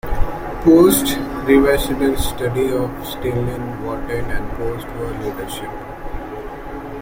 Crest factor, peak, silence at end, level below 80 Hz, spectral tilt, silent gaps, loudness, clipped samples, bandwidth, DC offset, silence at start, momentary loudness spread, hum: 18 dB; 0 dBFS; 0 s; -30 dBFS; -5.5 dB/octave; none; -18 LUFS; under 0.1%; 16.5 kHz; under 0.1%; 0.05 s; 17 LU; none